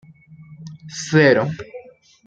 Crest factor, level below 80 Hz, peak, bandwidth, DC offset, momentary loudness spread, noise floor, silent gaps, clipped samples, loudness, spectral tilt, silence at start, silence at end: 20 dB; -60 dBFS; -2 dBFS; 8.8 kHz; under 0.1%; 25 LU; -44 dBFS; none; under 0.1%; -17 LUFS; -5.5 dB/octave; 0.6 s; 0.45 s